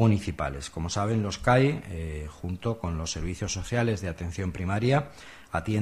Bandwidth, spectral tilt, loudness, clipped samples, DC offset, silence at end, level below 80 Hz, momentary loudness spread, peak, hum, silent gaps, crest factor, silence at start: 13 kHz; -6 dB/octave; -29 LUFS; under 0.1%; under 0.1%; 0 s; -42 dBFS; 12 LU; -10 dBFS; none; none; 18 dB; 0 s